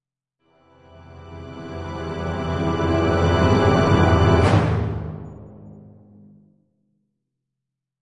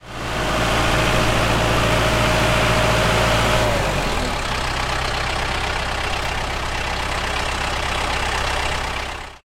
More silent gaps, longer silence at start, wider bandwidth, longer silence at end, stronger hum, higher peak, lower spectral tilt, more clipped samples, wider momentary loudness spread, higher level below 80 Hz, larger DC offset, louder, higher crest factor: neither; first, 1.1 s vs 0.05 s; second, 10 kHz vs 16.5 kHz; first, 2.2 s vs 0.1 s; neither; about the same, -2 dBFS vs -4 dBFS; first, -7.5 dB/octave vs -4 dB/octave; neither; first, 21 LU vs 6 LU; second, -42 dBFS vs -28 dBFS; neither; about the same, -19 LUFS vs -20 LUFS; about the same, 20 dB vs 16 dB